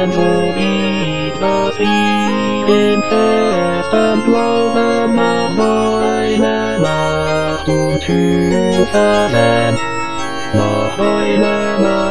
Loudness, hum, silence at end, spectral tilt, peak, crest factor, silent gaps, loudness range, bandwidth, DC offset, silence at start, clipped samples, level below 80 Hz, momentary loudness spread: -14 LUFS; none; 0 s; -5.5 dB/octave; 0 dBFS; 14 dB; none; 1 LU; 10.5 kHz; 4%; 0 s; under 0.1%; -40 dBFS; 4 LU